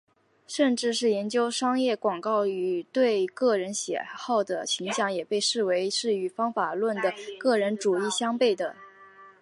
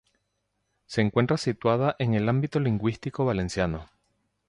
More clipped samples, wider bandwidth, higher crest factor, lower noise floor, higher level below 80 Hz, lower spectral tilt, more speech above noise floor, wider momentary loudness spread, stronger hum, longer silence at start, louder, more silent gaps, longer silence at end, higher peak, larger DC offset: neither; about the same, 11.5 kHz vs 11 kHz; about the same, 16 dB vs 18 dB; second, -51 dBFS vs -77 dBFS; second, -82 dBFS vs -50 dBFS; second, -3 dB/octave vs -7 dB/octave; second, 25 dB vs 52 dB; about the same, 5 LU vs 5 LU; second, none vs 50 Hz at -55 dBFS; second, 0.5 s vs 0.9 s; about the same, -27 LUFS vs -26 LUFS; neither; second, 0.1 s vs 0.65 s; about the same, -10 dBFS vs -8 dBFS; neither